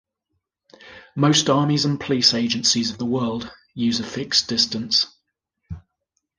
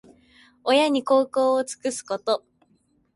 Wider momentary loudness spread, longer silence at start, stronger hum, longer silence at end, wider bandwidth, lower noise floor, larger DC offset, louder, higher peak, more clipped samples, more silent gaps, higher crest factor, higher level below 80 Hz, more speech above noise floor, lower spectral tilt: first, 18 LU vs 9 LU; first, 0.85 s vs 0.65 s; neither; second, 0.6 s vs 0.75 s; about the same, 10.5 kHz vs 11.5 kHz; first, -77 dBFS vs -65 dBFS; neither; first, -20 LUFS vs -23 LUFS; first, -2 dBFS vs -8 dBFS; neither; neither; about the same, 20 dB vs 16 dB; first, -54 dBFS vs -72 dBFS; first, 56 dB vs 43 dB; about the same, -3.5 dB/octave vs -2.5 dB/octave